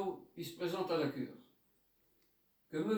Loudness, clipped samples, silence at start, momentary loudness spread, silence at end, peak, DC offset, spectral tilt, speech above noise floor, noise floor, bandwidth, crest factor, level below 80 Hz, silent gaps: -40 LUFS; under 0.1%; 0 s; 11 LU; 0 s; -24 dBFS; under 0.1%; -6 dB/octave; 36 dB; -75 dBFS; over 20 kHz; 16 dB; -82 dBFS; none